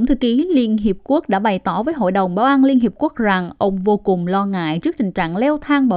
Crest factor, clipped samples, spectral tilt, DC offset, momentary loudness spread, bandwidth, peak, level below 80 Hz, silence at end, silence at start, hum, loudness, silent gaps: 14 dB; under 0.1%; -11.5 dB/octave; under 0.1%; 6 LU; 5 kHz; -2 dBFS; -40 dBFS; 0 s; 0 s; none; -17 LUFS; none